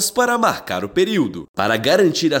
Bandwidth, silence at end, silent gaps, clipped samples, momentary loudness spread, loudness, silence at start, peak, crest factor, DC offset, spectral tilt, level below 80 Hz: 17 kHz; 0 s; 1.49-1.54 s; under 0.1%; 8 LU; -18 LUFS; 0 s; -2 dBFS; 14 dB; under 0.1%; -3.5 dB/octave; -54 dBFS